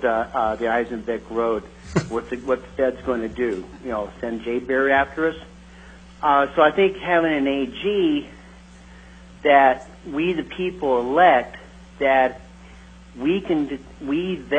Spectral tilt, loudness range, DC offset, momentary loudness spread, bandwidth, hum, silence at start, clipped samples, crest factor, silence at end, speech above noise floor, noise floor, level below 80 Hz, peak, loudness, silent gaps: -6 dB/octave; 4 LU; under 0.1%; 13 LU; 9.2 kHz; none; 0 s; under 0.1%; 20 dB; 0 s; 24 dB; -44 dBFS; -46 dBFS; -2 dBFS; -21 LUFS; none